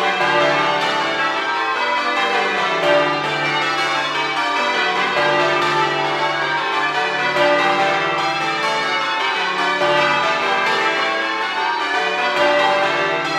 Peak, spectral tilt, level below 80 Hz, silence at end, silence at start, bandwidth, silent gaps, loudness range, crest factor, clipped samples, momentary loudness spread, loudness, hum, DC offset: -2 dBFS; -3 dB/octave; -64 dBFS; 0 s; 0 s; 14 kHz; none; 1 LU; 16 dB; under 0.1%; 3 LU; -17 LUFS; none; under 0.1%